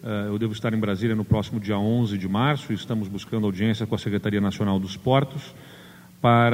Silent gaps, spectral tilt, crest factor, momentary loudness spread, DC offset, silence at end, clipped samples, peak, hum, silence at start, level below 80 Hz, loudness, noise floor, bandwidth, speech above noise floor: none; -7.5 dB/octave; 18 dB; 7 LU; under 0.1%; 0 s; under 0.1%; -6 dBFS; none; 0 s; -52 dBFS; -24 LUFS; -47 dBFS; 16 kHz; 23 dB